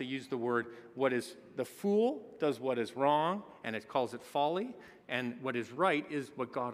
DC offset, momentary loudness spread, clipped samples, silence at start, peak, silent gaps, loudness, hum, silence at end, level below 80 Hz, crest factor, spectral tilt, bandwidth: under 0.1%; 10 LU; under 0.1%; 0 s; -16 dBFS; none; -35 LUFS; none; 0 s; -82 dBFS; 20 dB; -5.5 dB/octave; 15.5 kHz